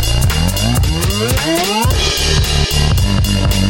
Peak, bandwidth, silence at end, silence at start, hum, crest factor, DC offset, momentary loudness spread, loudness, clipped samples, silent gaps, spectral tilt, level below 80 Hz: -2 dBFS; 17.5 kHz; 0 s; 0 s; none; 12 dB; under 0.1%; 1 LU; -14 LUFS; under 0.1%; none; -4 dB/octave; -18 dBFS